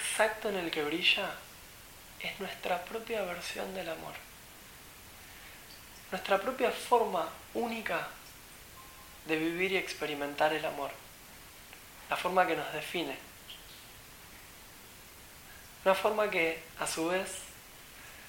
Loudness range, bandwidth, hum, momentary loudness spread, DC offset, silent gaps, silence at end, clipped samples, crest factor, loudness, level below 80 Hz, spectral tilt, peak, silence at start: 6 LU; 17 kHz; none; 21 LU; under 0.1%; none; 0 s; under 0.1%; 24 dB; -33 LUFS; -62 dBFS; -3 dB/octave; -12 dBFS; 0 s